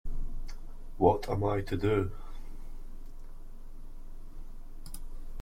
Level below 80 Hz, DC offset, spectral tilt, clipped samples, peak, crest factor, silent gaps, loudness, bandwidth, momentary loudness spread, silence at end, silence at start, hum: -38 dBFS; under 0.1%; -7.5 dB/octave; under 0.1%; -8 dBFS; 24 dB; none; -31 LUFS; 15.5 kHz; 25 LU; 0 s; 0.05 s; none